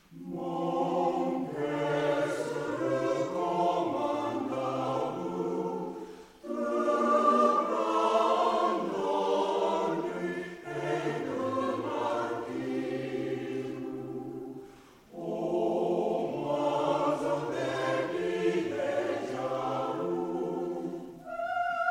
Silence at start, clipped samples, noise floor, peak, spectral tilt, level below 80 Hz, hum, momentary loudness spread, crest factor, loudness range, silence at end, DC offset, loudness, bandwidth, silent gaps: 0.1 s; under 0.1%; -53 dBFS; -12 dBFS; -6 dB/octave; -68 dBFS; none; 12 LU; 18 dB; 6 LU; 0 s; under 0.1%; -31 LUFS; 15.5 kHz; none